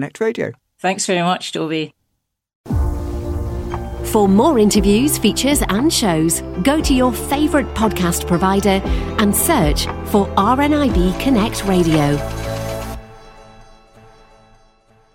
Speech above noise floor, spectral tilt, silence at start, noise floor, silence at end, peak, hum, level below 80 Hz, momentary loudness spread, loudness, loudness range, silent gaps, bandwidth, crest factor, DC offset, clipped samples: 57 dB; -5 dB/octave; 0 s; -72 dBFS; 1.55 s; -2 dBFS; none; -28 dBFS; 11 LU; -17 LUFS; 7 LU; 2.55-2.64 s; 16.5 kHz; 16 dB; under 0.1%; under 0.1%